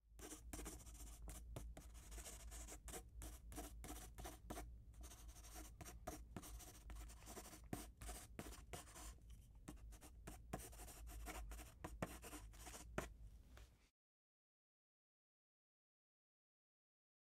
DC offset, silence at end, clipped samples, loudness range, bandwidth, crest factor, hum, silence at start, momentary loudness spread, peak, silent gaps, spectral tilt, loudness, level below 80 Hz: under 0.1%; 3.45 s; under 0.1%; 2 LU; 16 kHz; 30 dB; none; 0.05 s; 8 LU; -28 dBFS; none; -4 dB/octave; -57 LUFS; -60 dBFS